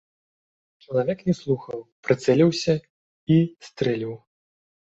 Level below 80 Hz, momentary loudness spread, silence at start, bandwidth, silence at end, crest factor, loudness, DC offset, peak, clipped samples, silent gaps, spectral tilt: -60 dBFS; 15 LU; 0.9 s; 8 kHz; 0.7 s; 20 dB; -23 LUFS; under 0.1%; -4 dBFS; under 0.1%; 1.92-2.03 s, 2.90-3.27 s; -7 dB/octave